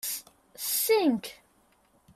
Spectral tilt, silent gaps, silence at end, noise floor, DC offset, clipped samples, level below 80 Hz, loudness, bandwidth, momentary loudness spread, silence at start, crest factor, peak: -2.5 dB/octave; none; 0.8 s; -65 dBFS; under 0.1%; under 0.1%; -72 dBFS; -27 LUFS; 16 kHz; 13 LU; 0.05 s; 16 dB; -14 dBFS